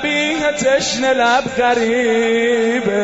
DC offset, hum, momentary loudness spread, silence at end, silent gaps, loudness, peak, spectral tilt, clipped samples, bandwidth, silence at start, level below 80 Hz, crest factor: 0.2%; none; 2 LU; 0 s; none; -15 LUFS; -2 dBFS; -3 dB/octave; under 0.1%; 8 kHz; 0 s; -50 dBFS; 12 dB